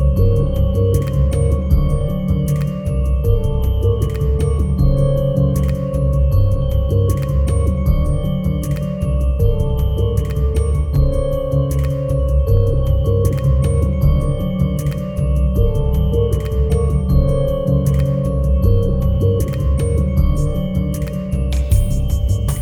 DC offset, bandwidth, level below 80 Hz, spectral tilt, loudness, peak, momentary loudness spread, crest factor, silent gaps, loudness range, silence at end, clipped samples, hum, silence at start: under 0.1%; 14.5 kHz; -18 dBFS; -8.5 dB/octave; -17 LUFS; -2 dBFS; 4 LU; 14 dB; none; 1 LU; 0 s; under 0.1%; none; 0 s